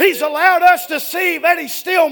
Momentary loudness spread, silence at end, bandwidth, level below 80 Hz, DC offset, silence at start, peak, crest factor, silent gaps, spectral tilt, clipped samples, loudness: 7 LU; 0 s; 20 kHz; -62 dBFS; under 0.1%; 0 s; 0 dBFS; 14 dB; none; -1 dB/octave; 0.1%; -14 LUFS